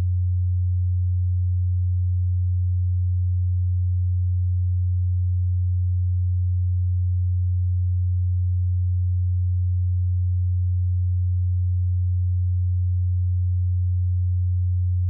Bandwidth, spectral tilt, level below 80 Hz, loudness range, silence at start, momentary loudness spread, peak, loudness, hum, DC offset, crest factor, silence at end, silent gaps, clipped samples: 0.2 kHz; -33 dB/octave; -34 dBFS; 0 LU; 0 s; 0 LU; -18 dBFS; -23 LUFS; none; under 0.1%; 4 dB; 0 s; none; under 0.1%